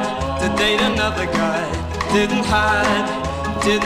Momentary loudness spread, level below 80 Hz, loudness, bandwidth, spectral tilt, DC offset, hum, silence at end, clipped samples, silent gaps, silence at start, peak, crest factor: 7 LU; -34 dBFS; -19 LUFS; 15.5 kHz; -4.5 dB/octave; 0.2%; none; 0 s; under 0.1%; none; 0 s; -6 dBFS; 14 dB